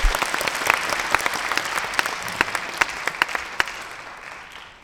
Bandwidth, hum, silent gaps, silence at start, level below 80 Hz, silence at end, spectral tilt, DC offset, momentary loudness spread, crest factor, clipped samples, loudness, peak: over 20 kHz; none; none; 0 s; -34 dBFS; 0 s; -1.5 dB/octave; under 0.1%; 16 LU; 24 dB; under 0.1%; -23 LUFS; 0 dBFS